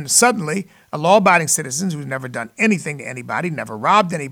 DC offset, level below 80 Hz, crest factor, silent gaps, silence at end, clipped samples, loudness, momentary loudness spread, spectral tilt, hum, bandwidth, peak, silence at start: under 0.1%; -64 dBFS; 18 dB; none; 0 s; under 0.1%; -17 LUFS; 13 LU; -3.5 dB/octave; none; 19 kHz; -2 dBFS; 0 s